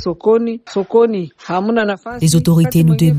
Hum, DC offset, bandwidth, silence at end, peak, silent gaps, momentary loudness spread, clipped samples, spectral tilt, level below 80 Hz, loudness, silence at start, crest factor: none; under 0.1%; 16 kHz; 0 s; -2 dBFS; none; 9 LU; under 0.1%; -6.5 dB/octave; -44 dBFS; -15 LUFS; 0 s; 12 dB